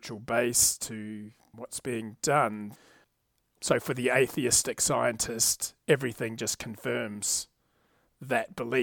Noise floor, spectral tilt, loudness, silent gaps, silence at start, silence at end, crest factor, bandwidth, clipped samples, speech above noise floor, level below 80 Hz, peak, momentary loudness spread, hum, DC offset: -75 dBFS; -2.5 dB/octave; -28 LUFS; none; 0.05 s; 0 s; 22 dB; 19 kHz; under 0.1%; 46 dB; -60 dBFS; -8 dBFS; 16 LU; none; under 0.1%